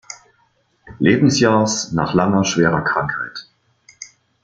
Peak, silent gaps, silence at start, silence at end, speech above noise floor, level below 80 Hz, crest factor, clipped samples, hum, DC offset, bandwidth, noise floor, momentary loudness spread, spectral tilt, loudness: -2 dBFS; none; 0.1 s; 0.35 s; 45 dB; -50 dBFS; 18 dB; under 0.1%; none; under 0.1%; 9.4 kHz; -61 dBFS; 23 LU; -5 dB/octave; -17 LUFS